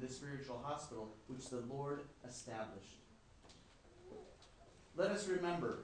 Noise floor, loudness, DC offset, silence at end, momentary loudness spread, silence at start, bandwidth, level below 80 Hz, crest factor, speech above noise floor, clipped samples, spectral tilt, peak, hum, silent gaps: -64 dBFS; -45 LUFS; under 0.1%; 0 s; 24 LU; 0 s; 10 kHz; -70 dBFS; 22 dB; 20 dB; under 0.1%; -5 dB/octave; -24 dBFS; none; none